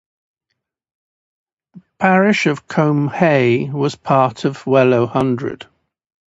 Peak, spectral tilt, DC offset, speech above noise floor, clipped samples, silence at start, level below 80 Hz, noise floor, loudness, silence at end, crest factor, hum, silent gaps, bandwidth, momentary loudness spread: 0 dBFS; -7 dB/octave; under 0.1%; 61 dB; under 0.1%; 1.75 s; -58 dBFS; -76 dBFS; -16 LUFS; 0.75 s; 18 dB; none; none; 8 kHz; 8 LU